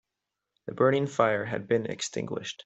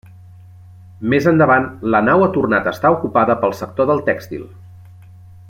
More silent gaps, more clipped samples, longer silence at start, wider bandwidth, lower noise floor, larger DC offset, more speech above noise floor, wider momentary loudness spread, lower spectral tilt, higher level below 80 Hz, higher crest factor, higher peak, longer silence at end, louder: neither; neither; second, 0.65 s vs 1 s; second, 8.2 kHz vs 16.5 kHz; first, -86 dBFS vs -40 dBFS; neither; first, 58 dB vs 25 dB; about the same, 11 LU vs 9 LU; second, -5 dB/octave vs -7.5 dB/octave; second, -70 dBFS vs -54 dBFS; first, 22 dB vs 16 dB; second, -8 dBFS vs -2 dBFS; second, 0.1 s vs 0.65 s; second, -28 LUFS vs -16 LUFS